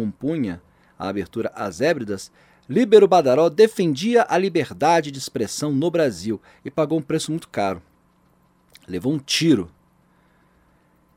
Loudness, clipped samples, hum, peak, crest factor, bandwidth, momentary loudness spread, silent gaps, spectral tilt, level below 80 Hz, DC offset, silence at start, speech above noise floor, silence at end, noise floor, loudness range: -20 LUFS; under 0.1%; none; -2 dBFS; 20 dB; 15.5 kHz; 15 LU; none; -5 dB/octave; -60 dBFS; under 0.1%; 0 s; 40 dB; 1.5 s; -60 dBFS; 8 LU